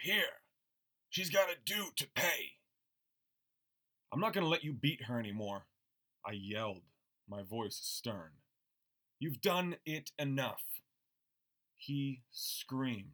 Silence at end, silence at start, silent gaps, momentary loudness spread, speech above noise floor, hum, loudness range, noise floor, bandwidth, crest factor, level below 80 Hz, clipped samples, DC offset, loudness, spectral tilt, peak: 0 s; 0 s; none; 13 LU; 48 dB; none; 6 LU; -87 dBFS; over 20 kHz; 22 dB; -84 dBFS; under 0.1%; under 0.1%; -38 LUFS; -4 dB/octave; -18 dBFS